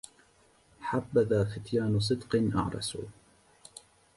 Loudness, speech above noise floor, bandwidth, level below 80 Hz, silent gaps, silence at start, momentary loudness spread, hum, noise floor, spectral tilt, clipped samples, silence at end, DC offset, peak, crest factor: -30 LUFS; 35 dB; 11.5 kHz; -54 dBFS; none; 0.8 s; 22 LU; none; -64 dBFS; -6 dB/octave; under 0.1%; 1.05 s; under 0.1%; -14 dBFS; 18 dB